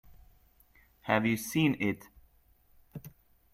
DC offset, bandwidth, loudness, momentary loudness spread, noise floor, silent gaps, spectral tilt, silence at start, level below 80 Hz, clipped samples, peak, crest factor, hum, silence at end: under 0.1%; 16 kHz; -30 LUFS; 21 LU; -65 dBFS; none; -5.5 dB/octave; 1.05 s; -64 dBFS; under 0.1%; -12 dBFS; 22 dB; none; 0.45 s